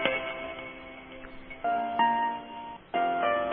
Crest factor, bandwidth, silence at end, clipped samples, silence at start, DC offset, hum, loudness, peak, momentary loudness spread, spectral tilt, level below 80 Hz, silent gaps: 20 dB; 3.8 kHz; 0 s; under 0.1%; 0 s; under 0.1%; none; -30 LUFS; -10 dBFS; 18 LU; -1 dB/octave; -60 dBFS; none